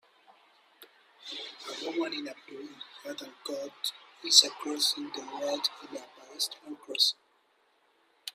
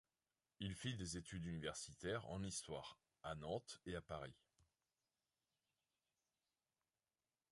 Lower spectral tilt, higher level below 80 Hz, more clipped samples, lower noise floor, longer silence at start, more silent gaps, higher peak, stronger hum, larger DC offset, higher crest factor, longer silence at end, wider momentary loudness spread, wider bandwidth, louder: second, 1 dB/octave vs -4.5 dB/octave; second, -88 dBFS vs -68 dBFS; neither; second, -69 dBFS vs under -90 dBFS; first, 0.8 s vs 0.6 s; neither; first, -4 dBFS vs -32 dBFS; neither; neither; first, 30 dB vs 20 dB; second, 0.05 s vs 3.15 s; first, 24 LU vs 6 LU; first, 16 kHz vs 11.5 kHz; first, -29 LUFS vs -50 LUFS